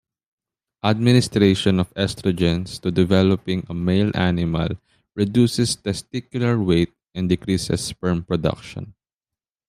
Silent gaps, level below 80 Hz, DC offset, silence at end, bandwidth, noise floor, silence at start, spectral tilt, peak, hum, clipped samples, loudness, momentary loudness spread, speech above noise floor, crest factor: none; -46 dBFS; under 0.1%; 0.8 s; 14.5 kHz; -90 dBFS; 0.85 s; -6 dB/octave; -2 dBFS; none; under 0.1%; -21 LUFS; 11 LU; 70 dB; 18 dB